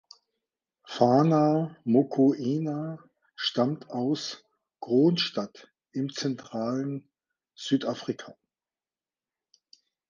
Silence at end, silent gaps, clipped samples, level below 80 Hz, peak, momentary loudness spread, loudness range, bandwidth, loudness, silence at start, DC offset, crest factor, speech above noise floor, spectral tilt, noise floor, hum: 1.8 s; none; under 0.1%; -78 dBFS; -6 dBFS; 17 LU; 9 LU; 7.4 kHz; -27 LUFS; 0.85 s; under 0.1%; 22 dB; over 64 dB; -6.5 dB/octave; under -90 dBFS; none